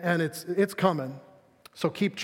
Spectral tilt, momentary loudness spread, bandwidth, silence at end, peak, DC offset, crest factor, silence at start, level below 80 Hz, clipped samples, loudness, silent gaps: -6 dB/octave; 11 LU; 17 kHz; 0 s; -8 dBFS; under 0.1%; 22 dB; 0 s; -74 dBFS; under 0.1%; -28 LUFS; none